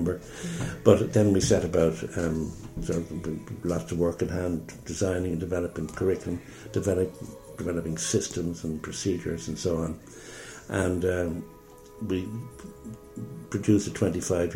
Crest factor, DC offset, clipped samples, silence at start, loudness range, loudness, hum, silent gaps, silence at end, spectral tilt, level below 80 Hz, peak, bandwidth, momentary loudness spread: 24 dB; under 0.1%; under 0.1%; 0 s; 6 LU; -28 LUFS; none; none; 0 s; -6 dB/octave; -48 dBFS; -4 dBFS; 16.5 kHz; 17 LU